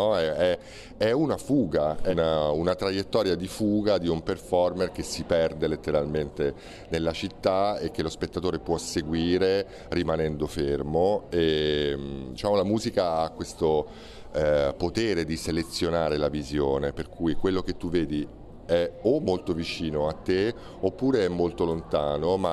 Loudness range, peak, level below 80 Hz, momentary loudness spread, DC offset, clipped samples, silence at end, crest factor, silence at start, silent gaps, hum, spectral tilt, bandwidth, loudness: 2 LU; -10 dBFS; -44 dBFS; 6 LU; under 0.1%; under 0.1%; 0 s; 18 dB; 0 s; none; none; -6 dB/octave; 13.5 kHz; -27 LUFS